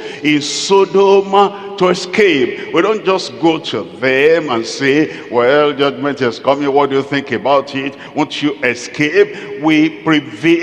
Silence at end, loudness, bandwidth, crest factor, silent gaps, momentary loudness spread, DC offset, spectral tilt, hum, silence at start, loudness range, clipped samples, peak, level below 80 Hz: 0 s; -14 LUFS; 10 kHz; 14 dB; none; 7 LU; under 0.1%; -4.5 dB/octave; none; 0 s; 3 LU; 0.1%; 0 dBFS; -58 dBFS